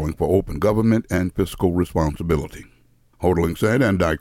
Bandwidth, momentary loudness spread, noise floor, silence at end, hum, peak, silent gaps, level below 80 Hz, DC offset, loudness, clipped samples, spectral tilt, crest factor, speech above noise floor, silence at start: 17 kHz; 6 LU; -54 dBFS; 0.05 s; none; -6 dBFS; none; -38 dBFS; under 0.1%; -21 LUFS; under 0.1%; -7 dB/octave; 14 dB; 34 dB; 0 s